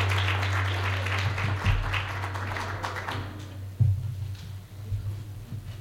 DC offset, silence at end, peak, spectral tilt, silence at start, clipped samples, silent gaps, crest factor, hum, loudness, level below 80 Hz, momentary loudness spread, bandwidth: under 0.1%; 0 s; -12 dBFS; -5 dB/octave; 0 s; under 0.1%; none; 18 dB; none; -30 LUFS; -40 dBFS; 13 LU; 14 kHz